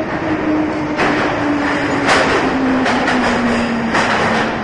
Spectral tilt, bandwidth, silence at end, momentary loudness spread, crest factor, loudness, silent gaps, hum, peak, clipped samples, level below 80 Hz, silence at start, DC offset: -5 dB/octave; 11.5 kHz; 0 s; 4 LU; 14 dB; -15 LUFS; none; none; -2 dBFS; under 0.1%; -40 dBFS; 0 s; under 0.1%